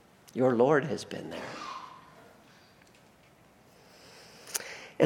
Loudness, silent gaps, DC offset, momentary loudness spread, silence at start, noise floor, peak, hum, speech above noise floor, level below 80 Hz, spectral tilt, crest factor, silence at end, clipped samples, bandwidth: -31 LUFS; none; under 0.1%; 26 LU; 0.35 s; -60 dBFS; -8 dBFS; none; 32 dB; -74 dBFS; -5 dB/octave; 26 dB; 0 s; under 0.1%; 17 kHz